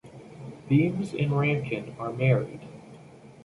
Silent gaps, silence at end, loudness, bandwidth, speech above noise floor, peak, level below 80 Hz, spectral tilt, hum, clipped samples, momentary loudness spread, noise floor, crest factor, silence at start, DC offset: none; 0.05 s; -26 LUFS; 11 kHz; 23 dB; -10 dBFS; -62 dBFS; -8.5 dB/octave; none; under 0.1%; 20 LU; -49 dBFS; 18 dB; 0.05 s; under 0.1%